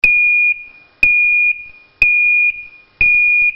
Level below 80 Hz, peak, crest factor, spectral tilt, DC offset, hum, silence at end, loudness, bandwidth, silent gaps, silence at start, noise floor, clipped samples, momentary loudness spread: -40 dBFS; 0 dBFS; 14 dB; 0 dB/octave; under 0.1%; none; 0 s; -11 LUFS; 7.2 kHz; none; 0.05 s; -36 dBFS; under 0.1%; 8 LU